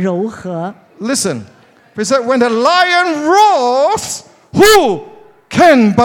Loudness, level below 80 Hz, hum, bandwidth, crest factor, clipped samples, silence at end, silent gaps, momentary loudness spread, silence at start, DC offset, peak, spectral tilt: -11 LUFS; -44 dBFS; none; 18 kHz; 12 dB; under 0.1%; 0 s; none; 15 LU; 0 s; under 0.1%; 0 dBFS; -4 dB/octave